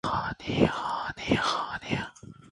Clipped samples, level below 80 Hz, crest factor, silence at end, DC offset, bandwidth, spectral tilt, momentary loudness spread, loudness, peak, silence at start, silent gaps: under 0.1%; -50 dBFS; 22 dB; 0 s; under 0.1%; 11.5 kHz; -5 dB/octave; 7 LU; -29 LUFS; -8 dBFS; 0.05 s; none